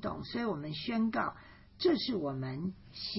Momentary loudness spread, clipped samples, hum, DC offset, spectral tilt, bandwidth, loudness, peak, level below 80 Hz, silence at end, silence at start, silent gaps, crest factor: 10 LU; under 0.1%; none; under 0.1%; -4.5 dB/octave; 5.8 kHz; -35 LUFS; -18 dBFS; -60 dBFS; 0 s; 0 s; none; 18 dB